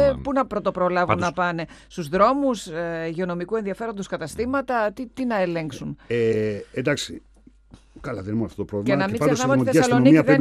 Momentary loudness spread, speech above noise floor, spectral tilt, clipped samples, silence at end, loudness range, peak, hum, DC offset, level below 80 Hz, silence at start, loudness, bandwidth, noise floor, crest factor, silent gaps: 13 LU; 28 dB; -6 dB/octave; under 0.1%; 0 s; 4 LU; -2 dBFS; none; under 0.1%; -50 dBFS; 0 s; -23 LUFS; 13.5 kHz; -50 dBFS; 20 dB; none